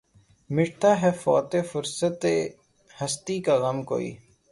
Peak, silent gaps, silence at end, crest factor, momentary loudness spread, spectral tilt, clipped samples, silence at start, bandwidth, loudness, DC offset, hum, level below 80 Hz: -8 dBFS; none; 0.35 s; 18 dB; 9 LU; -5 dB/octave; under 0.1%; 0.5 s; 11.5 kHz; -25 LUFS; under 0.1%; none; -64 dBFS